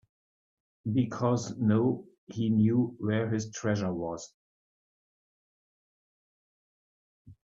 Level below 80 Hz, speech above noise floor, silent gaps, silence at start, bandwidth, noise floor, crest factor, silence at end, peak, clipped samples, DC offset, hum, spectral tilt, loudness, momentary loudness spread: -66 dBFS; over 62 dB; 2.18-2.27 s, 4.34-7.25 s; 0.85 s; 7.8 kHz; under -90 dBFS; 18 dB; 0.1 s; -14 dBFS; under 0.1%; under 0.1%; none; -7 dB/octave; -29 LUFS; 13 LU